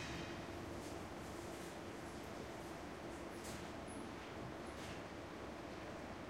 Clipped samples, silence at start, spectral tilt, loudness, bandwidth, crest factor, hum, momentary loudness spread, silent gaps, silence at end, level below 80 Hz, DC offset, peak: under 0.1%; 0 s; -4.5 dB/octave; -49 LUFS; 16 kHz; 14 dB; none; 1 LU; none; 0 s; -62 dBFS; under 0.1%; -36 dBFS